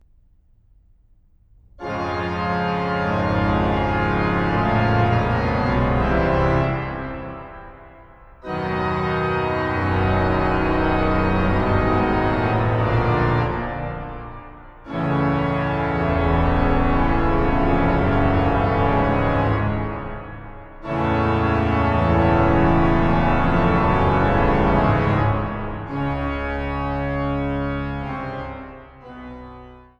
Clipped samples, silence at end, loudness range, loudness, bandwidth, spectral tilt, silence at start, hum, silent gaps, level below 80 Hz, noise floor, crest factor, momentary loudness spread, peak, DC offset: under 0.1%; 0.2 s; 7 LU; -20 LUFS; 7.2 kHz; -9 dB/octave; 1.75 s; none; none; -30 dBFS; -55 dBFS; 16 dB; 14 LU; -4 dBFS; under 0.1%